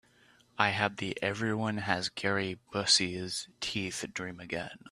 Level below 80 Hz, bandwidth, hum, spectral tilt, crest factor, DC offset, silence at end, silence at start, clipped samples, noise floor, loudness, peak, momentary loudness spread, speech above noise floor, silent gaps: -66 dBFS; 14.5 kHz; none; -3 dB/octave; 26 dB; under 0.1%; 0 s; 0.6 s; under 0.1%; -64 dBFS; -31 LUFS; -8 dBFS; 13 LU; 31 dB; none